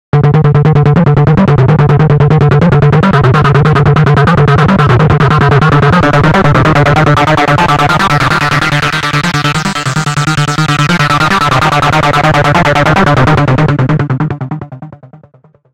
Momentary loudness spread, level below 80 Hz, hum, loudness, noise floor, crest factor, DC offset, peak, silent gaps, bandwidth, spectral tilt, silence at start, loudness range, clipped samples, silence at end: 4 LU; -28 dBFS; none; -8 LUFS; -43 dBFS; 8 dB; under 0.1%; 0 dBFS; none; 12 kHz; -6.5 dB/octave; 0.15 s; 3 LU; 1%; 0.55 s